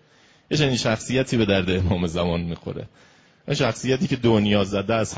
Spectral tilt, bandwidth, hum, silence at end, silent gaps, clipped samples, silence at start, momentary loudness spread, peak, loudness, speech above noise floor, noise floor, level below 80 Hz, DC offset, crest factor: -5.5 dB/octave; 8 kHz; none; 0 s; none; under 0.1%; 0.5 s; 10 LU; -6 dBFS; -22 LUFS; 34 dB; -56 dBFS; -40 dBFS; under 0.1%; 18 dB